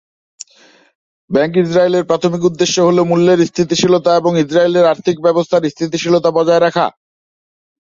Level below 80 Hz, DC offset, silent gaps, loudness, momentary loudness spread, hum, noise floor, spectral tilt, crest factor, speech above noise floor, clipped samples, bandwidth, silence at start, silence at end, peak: -56 dBFS; under 0.1%; none; -13 LUFS; 4 LU; none; -48 dBFS; -5.5 dB/octave; 12 dB; 36 dB; under 0.1%; 7.8 kHz; 1.3 s; 1.05 s; 0 dBFS